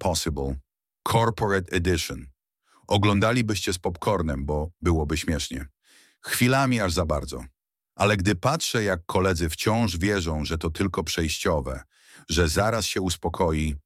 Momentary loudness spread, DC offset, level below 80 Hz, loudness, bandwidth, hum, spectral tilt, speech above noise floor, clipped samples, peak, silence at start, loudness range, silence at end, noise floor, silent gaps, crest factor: 10 LU; under 0.1%; -38 dBFS; -25 LUFS; 16 kHz; none; -5 dB/octave; 40 dB; under 0.1%; -6 dBFS; 0 s; 2 LU; 0.05 s; -65 dBFS; none; 20 dB